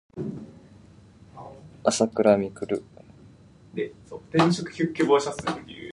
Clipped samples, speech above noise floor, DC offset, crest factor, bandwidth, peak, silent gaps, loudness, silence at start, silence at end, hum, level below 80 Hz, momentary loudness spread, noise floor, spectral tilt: under 0.1%; 27 dB; under 0.1%; 22 dB; 11.5 kHz; -4 dBFS; none; -25 LUFS; 0.15 s; 0 s; none; -60 dBFS; 23 LU; -51 dBFS; -5.5 dB/octave